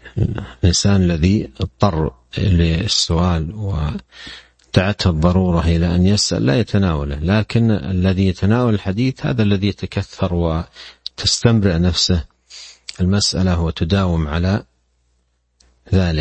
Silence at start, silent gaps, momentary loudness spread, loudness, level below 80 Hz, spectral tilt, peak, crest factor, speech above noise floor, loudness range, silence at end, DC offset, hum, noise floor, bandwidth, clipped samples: 0.05 s; none; 10 LU; -17 LUFS; -30 dBFS; -5.5 dB/octave; 0 dBFS; 16 dB; 48 dB; 3 LU; 0 s; under 0.1%; none; -64 dBFS; 8.8 kHz; under 0.1%